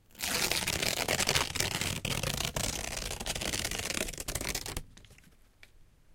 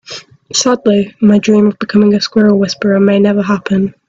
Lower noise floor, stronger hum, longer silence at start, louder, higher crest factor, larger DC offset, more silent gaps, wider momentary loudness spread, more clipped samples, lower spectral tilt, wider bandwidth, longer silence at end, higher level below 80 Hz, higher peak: first, -59 dBFS vs -31 dBFS; neither; about the same, 0.15 s vs 0.1 s; second, -32 LUFS vs -11 LUFS; first, 28 dB vs 10 dB; neither; neither; about the same, 7 LU vs 5 LU; neither; second, -2 dB/octave vs -5.5 dB/octave; first, 17 kHz vs 7.8 kHz; second, 0 s vs 0.15 s; first, -46 dBFS vs -52 dBFS; second, -8 dBFS vs 0 dBFS